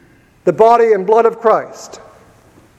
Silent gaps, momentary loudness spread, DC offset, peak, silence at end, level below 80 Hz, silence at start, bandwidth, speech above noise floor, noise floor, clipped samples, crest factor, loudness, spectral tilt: none; 14 LU; under 0.1%; 0 dBFS; 0.8 s; -56 dBFS; 0.45 s; 8.6 kHz; 35 dB; -46 dBFS; under 0.1%; 14 dB; -12 LUFS; -6 dB/octave